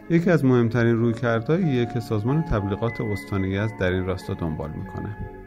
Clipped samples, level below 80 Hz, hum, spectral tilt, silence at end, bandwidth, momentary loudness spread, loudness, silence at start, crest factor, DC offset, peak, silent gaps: under 0.1%; -42 dBFS; none; -8.5 dB/octave; 0 s; 14 kHz; 12 LU; -24 LUFS; 0 s; 16 dB; under 0.1%; -6 dBFS; none